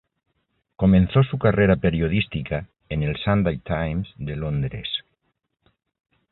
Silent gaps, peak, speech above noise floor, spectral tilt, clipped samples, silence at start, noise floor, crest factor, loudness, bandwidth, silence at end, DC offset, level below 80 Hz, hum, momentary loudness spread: none; -6 dBFS; 52 dB; -12 dB/octave; under 0.1%; 0.8 s; -73 dBFS; 18 dB; -22 LUFS; 4.1 kHz; 1.3 s; under 0.1%; -38 dBFS; none; 12 LU